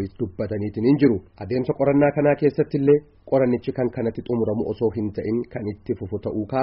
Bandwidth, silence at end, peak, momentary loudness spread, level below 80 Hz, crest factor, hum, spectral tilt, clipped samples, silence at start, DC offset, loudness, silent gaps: 5.6 kHz; 0 s; -6 dBFS; 10 LU; -52 dBFS; 16 dB; none; -8 dB/octave; under 0.1%; 0 s; under 0.1%; -22 LUFS; none